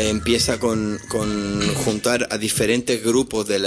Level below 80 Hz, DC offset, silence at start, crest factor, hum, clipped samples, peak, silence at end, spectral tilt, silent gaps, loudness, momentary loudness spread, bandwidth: -42 dBFS; under 0.1%; 0 s; 16 dB; none; under 0.1%; -6 dBFS; 0 s; -4 dB/octave; none; -20 LUFS; 5 LU; 11 kHz